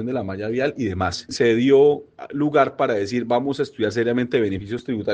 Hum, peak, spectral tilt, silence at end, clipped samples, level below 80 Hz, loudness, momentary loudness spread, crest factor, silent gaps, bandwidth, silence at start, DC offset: none; -2 dBFS; -6 dB/octave; 0 s; under 0.1%; -58 dBFS; -21 LUFS; 11 LU; 18 dB; none; 9.2 kHz; 0 s; under 0.1%